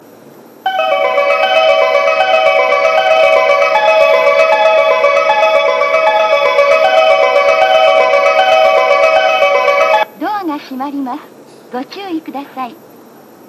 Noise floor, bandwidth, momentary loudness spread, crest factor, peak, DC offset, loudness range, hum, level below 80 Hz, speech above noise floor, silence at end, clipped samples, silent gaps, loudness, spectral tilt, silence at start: -38 dBFS; 13 kHz; 14 LU; 10 dB; 0 dBFS; under 0.1%; 6 LU; none; -60 dBFS; 16 dB; 0.75 s; under 0.1%; none; -10 LUFS; -2 dB/octave; 0.65 s